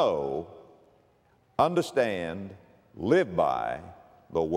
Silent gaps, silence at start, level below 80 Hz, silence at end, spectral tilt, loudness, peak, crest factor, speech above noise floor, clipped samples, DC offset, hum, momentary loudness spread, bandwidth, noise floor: none; 0 s; -60 dBFS; 0 s; -6 dB/octave; -28 LUFS; -10 dBFS; 20 dB; 38 dB; under 0.1%; under 0.1%; none; 15 LU; 15 kHz; -65 dBFS